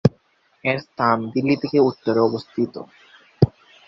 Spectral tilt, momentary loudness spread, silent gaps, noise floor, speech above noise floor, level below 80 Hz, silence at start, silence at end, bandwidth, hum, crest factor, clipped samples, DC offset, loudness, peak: -8.5 dB/octave; 7 LU; none; -61 dBFS; 40 dB; -48 dBFS; 0.05 s; 0.4 s; 7.4 kHz; none; 22 dB; under 0.1%; under 0.1%; -21 LUFS; 0 dBFS